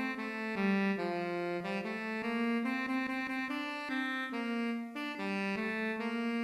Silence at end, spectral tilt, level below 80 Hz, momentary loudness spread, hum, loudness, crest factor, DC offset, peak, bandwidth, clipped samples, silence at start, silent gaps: 0 s; -6 dB/octave; -76 dBFS; 5 LU; none; -35 LUFS; 16 dB; under 0.1%; -20 dBFS; 13.5 kHz; under 0.1%; 0 s; none